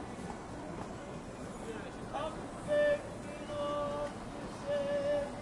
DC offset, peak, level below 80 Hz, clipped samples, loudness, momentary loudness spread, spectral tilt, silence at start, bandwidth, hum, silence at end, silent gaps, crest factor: under 0.1%; -20 dBFS; -56 dBFS; under 0.1%; -38 LUFS; 12 LU; -5.5 dB/octave; 0 s; 11.5 kHz; none; 0 s; none; 16 dB